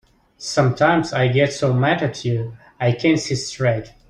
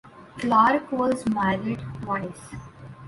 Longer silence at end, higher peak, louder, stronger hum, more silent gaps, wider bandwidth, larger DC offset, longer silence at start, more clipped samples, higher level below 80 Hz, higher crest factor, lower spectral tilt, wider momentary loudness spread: first, 0.2 s vs 0 s; first, -2 dBFS vs -6 dBFS; first, -19 LUFS vs -24 LUFS; neither; neither; second, 10 kHz vs 11.5 kHz; neither; first, 0.4 s vs 0.05 s; neither; about the same, -52 dBFS vs -54 dBFS; about the same, 16 dB vs 20 dB; about the same, -5.5 dB/octave vs -6.5 dB/octave; second, 7 LU vs 22 LU